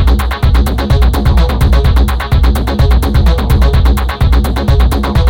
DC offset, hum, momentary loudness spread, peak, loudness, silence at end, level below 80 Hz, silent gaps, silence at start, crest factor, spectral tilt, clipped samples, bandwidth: under 0.1%; none; 2 LU; 0 dBFS; -11 LUFS; 0 s; -10 dBFS; none; 0 s; 8 dB; -6.5 dB/octave; under 0.1%; 16.5 kHz